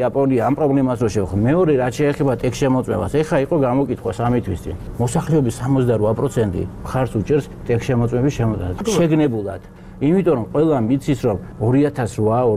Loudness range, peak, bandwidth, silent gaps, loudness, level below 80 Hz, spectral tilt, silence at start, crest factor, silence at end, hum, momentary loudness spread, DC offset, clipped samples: 2 LU; -4 dBFS; 15 kHz; none; -19 LUFS; -38 dBFS; -7.5 dB/octave; 0 s; 14 dB; 0 s; none; 6 LU; 0.2%; under 0.1%